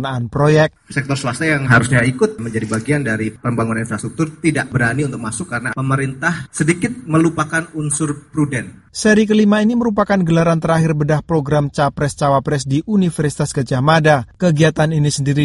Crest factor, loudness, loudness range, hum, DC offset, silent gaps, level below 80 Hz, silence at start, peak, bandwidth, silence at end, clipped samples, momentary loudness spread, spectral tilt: 16 dB; -16 LUFS; 4 LU; none; under 0.1%; none; -44 dBFS; 0 s; 0 dBFS; 11.5 kHz; 0 s; under 0.1%; 8 LU; -6 dB/octave